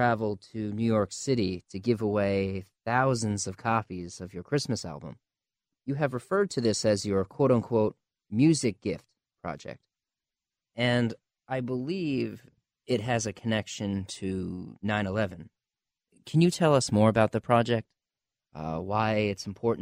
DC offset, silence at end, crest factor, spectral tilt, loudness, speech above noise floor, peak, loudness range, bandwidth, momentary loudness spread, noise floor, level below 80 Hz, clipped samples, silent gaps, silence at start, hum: under 0.1%; 0 s; 20 dB; -5.5 dB/octave; -28 LUFS; over 62 dB; -10 dBFS; 6 LU; 14.5 kHz; 15 LU; under -90 dBFS; -60 dBFS; under 0.1%; none; 0 s; none